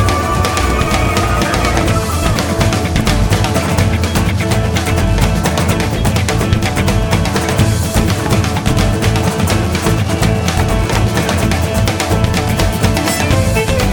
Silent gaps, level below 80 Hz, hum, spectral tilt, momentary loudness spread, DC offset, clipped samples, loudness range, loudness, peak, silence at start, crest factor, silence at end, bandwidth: none; -20 dBFS; none; -5 dB/octave; 1 LU; under 0.1%; under 0.1%; 0 LU; -14 LUFS; 0 dBFS; 0 s; 12 dB; 0 s; 20 kHz